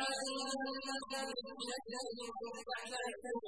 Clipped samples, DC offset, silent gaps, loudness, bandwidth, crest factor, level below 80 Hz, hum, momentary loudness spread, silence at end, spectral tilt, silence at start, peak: under 0.1%; under 0.1%; none; -42 LUFS; 11 kHz; 16 dB; -76 dBFS; none; 5 LU; 0 s; -1 dB/octave; 0 s; -26 dBFS